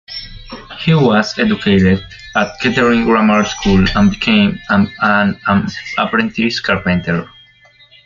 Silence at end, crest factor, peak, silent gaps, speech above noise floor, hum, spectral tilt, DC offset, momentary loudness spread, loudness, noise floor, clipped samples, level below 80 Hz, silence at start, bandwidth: 0.8 s; 12 dB; -2 dBFS; none; 33 dB; none; -6 dB/octave; under 0.1%; 9 LU; -14 LUFS; -47 dBFS; under 0.1%; -34 dBFS; 0.1 s; 7.4 kHz